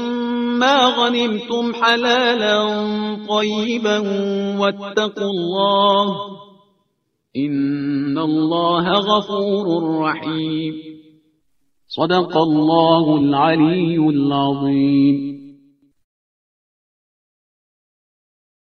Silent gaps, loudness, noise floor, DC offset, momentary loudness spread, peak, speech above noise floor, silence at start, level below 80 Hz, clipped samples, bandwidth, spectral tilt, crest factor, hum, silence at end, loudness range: none; -17 LUFS; -71 dBFS; under 0.1%; 8 LU; 0 dBFS; 54 dB; 0 s; -62 dBFS; under 0.1%; 6.6 kHz; -6 dB/octave; 18 dB; none; 3.15 s; 5 LU